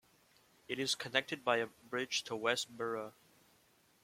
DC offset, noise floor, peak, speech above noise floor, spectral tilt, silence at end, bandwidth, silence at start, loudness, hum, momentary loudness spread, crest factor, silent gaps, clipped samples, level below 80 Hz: under 0.1%; -70 dBFS; -14 dBFS; 33 dB; -2 dB/octave; 0.95 s; 16.5 kHz; 0.7 s; -37 LUFS; none; 8 LU; 26 dB; none; under 0.1%; -82 dBFS